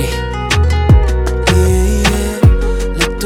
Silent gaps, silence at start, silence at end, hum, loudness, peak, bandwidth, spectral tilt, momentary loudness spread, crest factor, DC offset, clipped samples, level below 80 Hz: none; 0 s; 0 s; none; -13 LUFS; 0 dBFS; 16 kHz; -5.5 dB/octave; 6 LU; 12 dB; under 0.1%; under 0.1%; -14 dBFS